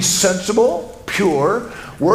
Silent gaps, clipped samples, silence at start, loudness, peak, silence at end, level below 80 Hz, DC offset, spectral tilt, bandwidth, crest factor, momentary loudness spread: none; under 0.1%; 0 s; -17 LUFS; 0 dBFS; 0 s; -46 dBFS; under 0.1%; -3.5 dB/octave; 16 kHz; 16 dB; 9 LU